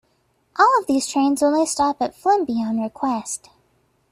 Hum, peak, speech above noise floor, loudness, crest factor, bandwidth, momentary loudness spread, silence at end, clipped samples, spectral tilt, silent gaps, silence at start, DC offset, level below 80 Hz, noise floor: none; -4 dBFS; 45 dB; -20 LUFS; 18 dB; 14.5 kHz; 10 LU; 0.75 s; under 0.1%; -3.5 dB/octave; none; 0.55 s; under 0.1%; -60 dBFS; -65 dBFS